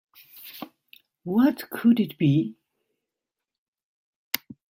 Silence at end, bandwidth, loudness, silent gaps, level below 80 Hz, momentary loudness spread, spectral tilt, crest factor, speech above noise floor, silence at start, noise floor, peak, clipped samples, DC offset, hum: 0.3 s; 16.5 kHz; -24 LUFS; 3.58-3.73 s, 3.83-4.31 s; -70 dBFS; 20 LU; -6.5 dB/octave; 26 dB; 65 dB; 0.35 s; -87 dBFS; 0 dBFS; under 0.1%; under 0.1%; none